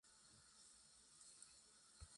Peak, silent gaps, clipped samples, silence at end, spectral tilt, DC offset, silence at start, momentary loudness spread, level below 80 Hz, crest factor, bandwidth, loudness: -46 dBFS; none; under 0.1%; 0 s; -1 dB/octave; under 0.1%; 0.05 s; 5 LU; -76 dBFS; 22 dB; 11.5 kHz; -65 LUFS